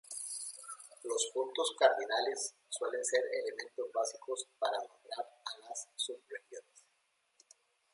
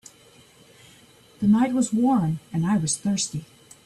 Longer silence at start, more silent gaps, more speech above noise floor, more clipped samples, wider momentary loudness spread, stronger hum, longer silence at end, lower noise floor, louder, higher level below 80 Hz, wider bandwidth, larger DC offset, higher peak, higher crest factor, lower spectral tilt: second, 0.1 s vs 1.4 s; neither; first, 42 dB vs 31 dB; neither; first, 16 LU vs 7 LU; neither; first, 1.35 s vs 0.4 s; first, -77 dBFS vs -53 dBFS; second, -36 LUFS vs -23 LUFS; second, under -90 dBFS vs -60 dBFS; about the same, 11.5 kHz vs 12.5 kHz; neither; second, -14 dBFS vs -10 dBFS; first, 24 dB vs 14 dB; second, 1.5 dB/octave vs -5 dB/octave